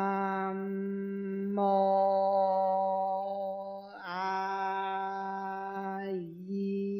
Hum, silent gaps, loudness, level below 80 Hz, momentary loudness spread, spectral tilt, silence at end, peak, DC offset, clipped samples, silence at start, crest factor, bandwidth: none; none; -32 LUFS; -84 dBFS; 11 LU; -8 dB/octave; 0 s; -18 dBFS; under 0.1%; under 0.1%; 0 s; 14 dB; 6.2 kHz